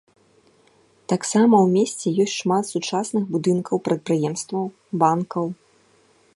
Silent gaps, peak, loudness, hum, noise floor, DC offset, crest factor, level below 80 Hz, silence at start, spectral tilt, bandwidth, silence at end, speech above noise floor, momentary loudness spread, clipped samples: none; -4 dBFS; -21 LUFS; none; -58 dBFS; under 0.1%; 18 dB; -70 dBFS; 1.1 s; -5.5 dB/octave; 11.5 kHz; 0.8 s; 38 dB; 11 LU; under 0.1%